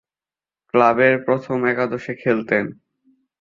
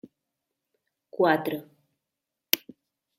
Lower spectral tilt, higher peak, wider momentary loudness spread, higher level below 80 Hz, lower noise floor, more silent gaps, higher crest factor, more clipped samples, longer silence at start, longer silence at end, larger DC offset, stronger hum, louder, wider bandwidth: first, -8 dB/octave vs -3.5 dB/octave; about the same, -2 dBFS vs 0 dBFS; second, 9 LU vs 14 LU; first, -62 dBFS vs -78 dBFS; first, under -90 dBFS vs -86 dBFS; neither; second, 18 dB vs 32 dB; neither; second, 0.75 s vs 1.15 s; about the same, 0.7 s vs 0.6 s; neither; neither; first, -19 LUFS vs -26 LUFS; second, 7.2 kHz vs 16 kHz